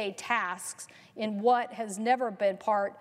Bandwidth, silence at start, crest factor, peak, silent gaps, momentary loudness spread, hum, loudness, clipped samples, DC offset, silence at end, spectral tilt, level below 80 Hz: 14.5 kHz; 0 s; 16 dB; -14 dBFS; none; 12 LU; none; -30 LUFS; under 0.1%; under 0.1%; 0 s; -3.5 dB/octave; -84 dBFS